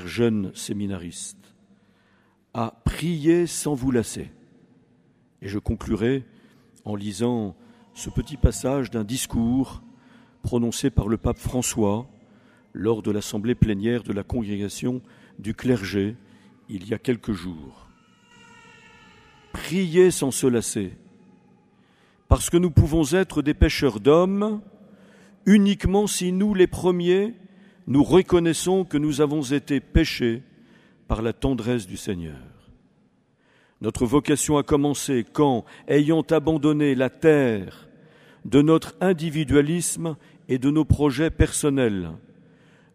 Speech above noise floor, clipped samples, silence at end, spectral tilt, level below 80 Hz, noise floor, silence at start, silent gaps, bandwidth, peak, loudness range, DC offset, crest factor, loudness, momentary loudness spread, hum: 40 dB; under 0.1%; 0.75 s; -5.5 dB/octave; -36 dBFS; -62 dBFS; 0 s; none; 15.5 kHz; -4 dBFS; 8 LU; under 0.1%; 20 dB; -23 LUFS; 14 LU; none